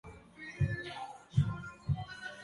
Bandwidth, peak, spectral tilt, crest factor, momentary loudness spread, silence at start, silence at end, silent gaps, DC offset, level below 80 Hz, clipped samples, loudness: 11.5 kHz; -16 dBFS; -7 dB/octave; 20 dB; 14 LU; 0.05 s; 0 s; none; under 0.1%; -50 dBFS; under 0.1%; -37 LUFS